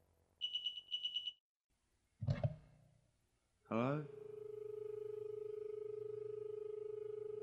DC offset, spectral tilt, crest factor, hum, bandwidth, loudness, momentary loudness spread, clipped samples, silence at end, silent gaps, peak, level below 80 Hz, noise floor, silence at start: under 0.1%; -6.5 dB/octave; 22 dB; none; 10.5 kHz; -45 LUFS; 8 LU; under 0.1%; 0 s; 1.40-1.70 s; -24 dBFS; -68 dBFS; -81 dBFS; 0.4 s